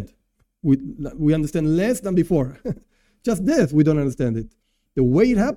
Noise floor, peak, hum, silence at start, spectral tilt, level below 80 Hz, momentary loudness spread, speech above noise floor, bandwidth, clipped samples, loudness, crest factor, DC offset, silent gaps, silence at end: -66 dBFS; -4 dBFS; none; 0 s; -7.5 dB/octave; -40 dBFS; 14 LU; 47 dB; 15 kHz; under 0.1%; -21 LUFS; 16 dB; under 0.1%; none; 0 s